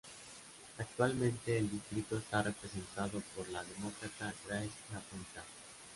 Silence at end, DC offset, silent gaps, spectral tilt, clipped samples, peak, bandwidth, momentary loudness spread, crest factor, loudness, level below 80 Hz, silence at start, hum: 0 s; under 0.1%; none; -5 dB/octave; under 0.1%; -18 dBFS; 11.5 kHz; 16 LU; 22 dB; -40 LUFS; -64 dBFS; 0.05 s; none